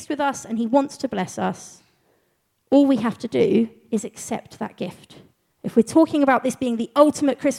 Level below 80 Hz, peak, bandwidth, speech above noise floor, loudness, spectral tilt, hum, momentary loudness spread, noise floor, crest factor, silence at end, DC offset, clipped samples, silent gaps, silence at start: -64 dBFS; -2 dBFS; 14 kHz; 48 dB; -21 LUFS; -5.5 dB/octave; none; 13 LU; -69 dBFS; 20 dB; 0 s; under 0.1%; under 0.1%; none; 0 s